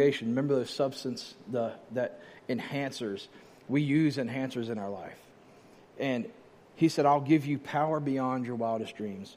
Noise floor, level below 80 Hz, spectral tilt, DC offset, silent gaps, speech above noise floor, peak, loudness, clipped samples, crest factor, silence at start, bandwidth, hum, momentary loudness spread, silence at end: -56 dBFS; -76 dBFS; -6.5 dB/octave; under 0.1%; none; 26 dB; -12 dBFS; -31 LUFS; under 0.1%; 18 dB; 0 s; 14.5 kHz; none; 13 LU; 0 s